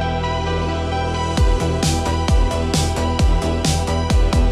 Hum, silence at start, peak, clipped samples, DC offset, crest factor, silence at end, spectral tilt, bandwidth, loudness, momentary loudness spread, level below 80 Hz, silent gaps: none; 0 s; -6 dBFS; under 0.1%; under 0.1%; 12 dB; 0 s; -5 dB/octave; 13.5 kHz; -19 LUFS; 3 LU; -20 dBFS; none